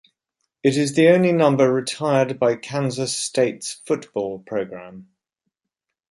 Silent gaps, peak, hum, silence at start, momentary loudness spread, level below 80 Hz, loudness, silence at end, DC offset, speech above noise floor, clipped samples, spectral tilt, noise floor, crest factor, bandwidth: none; -4 dBFS; none; 0.65 s; 12 LU; -66 dBFS; -20 LUFS; 1.1 s; under 0.1%; 63 dB; under 0.1%; -5 dB/octave; -83 dBFS; 18 dB; 11.5 kHz